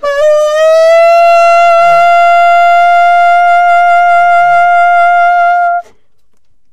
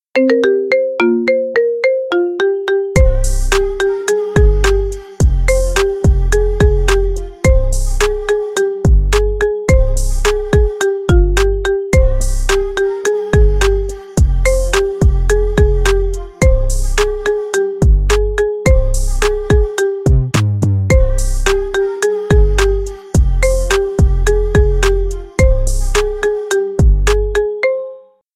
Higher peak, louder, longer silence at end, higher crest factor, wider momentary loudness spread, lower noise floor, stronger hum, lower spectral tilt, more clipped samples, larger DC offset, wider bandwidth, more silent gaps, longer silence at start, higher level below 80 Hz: about the same, -2 dBFS vs 0 dBFS; first, -6 LUFS vs -15 LUFS; second, 0 s vs 0.35 s; second, 6 dB vs 12 dB; about the same, 3 LU vs 4 LU; first, -60 dBFS vs -34 dBFS; neither; second, -1 dB/octave vs -5.5 dB/octave; neither; first, 7% vs under 0.1%; second, 9.6 kHz vs 14.5 kHz; neither; second, 0 s vs 0.15 s; second, -50 dBFS vs -16 dBFS